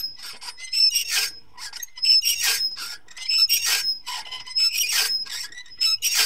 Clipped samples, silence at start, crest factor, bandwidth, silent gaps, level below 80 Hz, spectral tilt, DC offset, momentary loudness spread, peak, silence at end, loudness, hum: under 0.1%; 0 s; 18 dB; 16.5 kHz; none; -64 dBFS; 4 dB/octave; 0.7%; 17 LU; -6 dBFS; 0 s; -20 LUFS; none